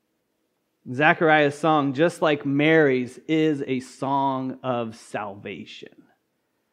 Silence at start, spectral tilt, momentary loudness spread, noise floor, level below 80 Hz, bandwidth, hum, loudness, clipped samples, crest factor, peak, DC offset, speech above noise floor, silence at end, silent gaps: 0.85 s; -6 dB/octave; 17 LU; -73 dBFS; -76 dBFS; 11.5 kHz; none; -22 LUFS; under 0.1%; 22 dB; -2 dBFS; under 0.1%; 51 dB; 0.85 s; none